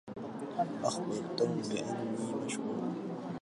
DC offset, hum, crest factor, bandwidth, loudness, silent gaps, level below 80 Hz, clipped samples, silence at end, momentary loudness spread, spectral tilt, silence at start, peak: under 0.1%; none; 20 dB; 11.5 kHz; -36 LUFS; none; -76 dBFS; under 0.1%; 0.05 s; 7 LU; -5.5 dB/octave; 0.05 s; -16 dBFS